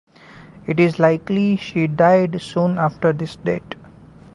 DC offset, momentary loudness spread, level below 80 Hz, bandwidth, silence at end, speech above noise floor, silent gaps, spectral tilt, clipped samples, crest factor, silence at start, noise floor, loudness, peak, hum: under 0.1%; 11 LU; -54 dBFS; 11 kHz; 0.6 s; 26 dB; none; -8 dB/octave; under 0.1%; 18 dB; 0.65 s; -43 dBFS; -18 LUFS; -2 dBFS; none